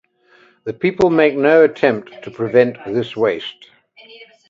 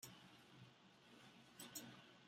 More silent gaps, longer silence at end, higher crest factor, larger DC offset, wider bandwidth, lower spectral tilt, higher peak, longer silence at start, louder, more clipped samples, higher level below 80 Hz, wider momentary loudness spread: neither; first, 0.25 s vs 0 s; second, 18 dB vs 26 dB; neither; second, 7.4 kHz vs 16 kHz; first, -7 dB/octave vs -2.5 dB/octave; first, 0 dBFS vs -36 dBFS; first, 0.65 s vs 0 s; first, -16 LUFS vs -60 LUFS; neither; first, -56 dBFS vs under -90 dBFS; first, 17 LU vs 12 LU